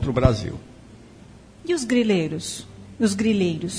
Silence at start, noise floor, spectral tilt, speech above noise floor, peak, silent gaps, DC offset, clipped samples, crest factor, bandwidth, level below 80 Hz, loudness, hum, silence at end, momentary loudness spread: 0 s; -46 dBFS; -5.5 dB/octave; 25 dB; -4 dBFS; none; under 0.1%; under 0.1%; 20 dB; 11 kHz; -40 dBFS; -23 LUFS; none; 0 s; 16 LU